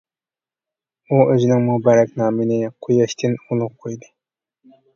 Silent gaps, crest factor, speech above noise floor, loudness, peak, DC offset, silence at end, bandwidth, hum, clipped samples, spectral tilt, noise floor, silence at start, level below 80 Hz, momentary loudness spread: none; 18 dB; over 73 dB; -18 LUFS; 0 dBFS; under 0.1%; 0.95 s; 7.4 kHz; none; under 0.1%; -7.5 dB/octave; under -90 dBFS; 1.1 s; -62 dBFS; 12 LU